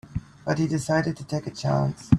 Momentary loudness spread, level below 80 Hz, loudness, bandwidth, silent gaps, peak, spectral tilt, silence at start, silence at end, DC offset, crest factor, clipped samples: 8 LU; -44 dBFS; -26 LUFS; 12 kHz; none; -4 dBFS; -6.5 dB/octave; 0.1 s; 0 s; under 0.1%; 22 dB; under 0.1%